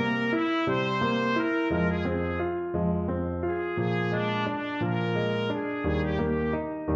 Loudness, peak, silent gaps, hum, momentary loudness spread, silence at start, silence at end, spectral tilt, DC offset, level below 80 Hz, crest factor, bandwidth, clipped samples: -28 LUFS; -14 dBFS; none; none; 4 LU; 0 s; 0 s; -8 dB/octave; under 0.1%; -46 dBFS; 14 dB; 7.4 kHz; under 0.1%